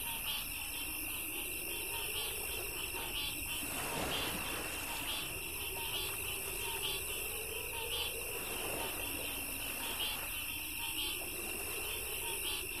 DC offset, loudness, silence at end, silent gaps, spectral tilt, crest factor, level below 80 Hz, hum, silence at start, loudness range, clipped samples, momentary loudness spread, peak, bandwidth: 0.2%; -37 LUFS; 0 s; none; -1 dB/octave; 14 dB; -54 dBFS; none; 0 s; 0 LU; under 0.1%; 2 LU; -24 dBFS; 15.5 kHz